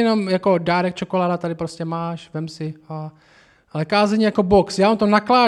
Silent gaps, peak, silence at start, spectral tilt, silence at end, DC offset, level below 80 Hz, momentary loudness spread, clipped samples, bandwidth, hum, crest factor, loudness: none; -2 dBFS; 0 s; -6.5 dB/octave; 0 s; under 0.1%; -50 dBFS; 16 LU; under 0.1%; 11 kHz; none; 16 dB; -19 LUFS